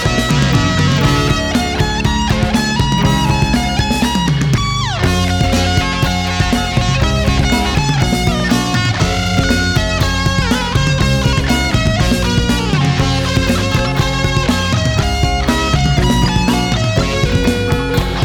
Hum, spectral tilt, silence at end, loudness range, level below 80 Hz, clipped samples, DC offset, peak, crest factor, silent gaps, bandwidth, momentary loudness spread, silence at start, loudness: none; -5 dB/octave; 0 s; 0 LU; -22 dBFS; under 0.1%; under 0.1%; -2 dBFS; 12 dB; none; 19 kHz; 2 LU; 0 s; -14 LUFS